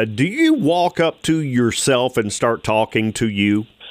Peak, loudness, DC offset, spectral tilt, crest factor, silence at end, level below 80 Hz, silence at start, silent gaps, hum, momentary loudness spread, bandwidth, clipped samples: -4 dBFS; -18 LUFS; under 0.1%; -5 dB/octave; 14 dB; 0 s; -52 dBFS; 0 s; none; none; 4 LU; 16 kHz; under 0.1%